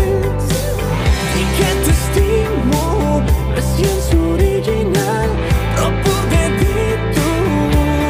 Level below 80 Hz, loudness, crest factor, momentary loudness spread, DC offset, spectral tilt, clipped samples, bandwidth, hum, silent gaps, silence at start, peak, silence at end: -20 dBFS; -16 LUFS; 12 dB; 3 LU; under 0.1%; -5.5 dB/octave; under 0.1%; 16 kHz; none; none; 0 s; -2 dBFS; 0 s